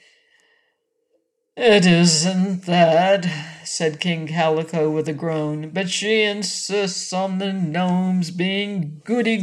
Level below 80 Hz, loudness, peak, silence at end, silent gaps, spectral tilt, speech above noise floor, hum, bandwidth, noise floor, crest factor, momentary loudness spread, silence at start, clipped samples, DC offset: -66 dBFS; -20 LUFS; -4 dBFS; 0 s; none; -4.5 dB/octave; 50 dB; none; 11.5 kHz; -70 dBFS; 16 dB; 10 LU; 1.55 s; under 0.1%; under 0.1%